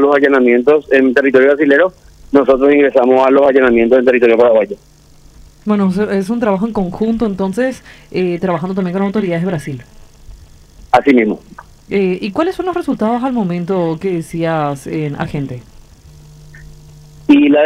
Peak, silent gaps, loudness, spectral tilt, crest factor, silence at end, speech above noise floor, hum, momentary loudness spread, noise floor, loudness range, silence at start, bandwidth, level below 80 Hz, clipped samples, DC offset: 0 dBFS; none; -13 LUFS; -7.5 dB/octave; 14 dB; 0 s; 29 dB; none; 11 LU; -41 dBFS; 8 LU; 0 s; 12.5 kHz; -42 dBFS; under 0.1%; under 0.1%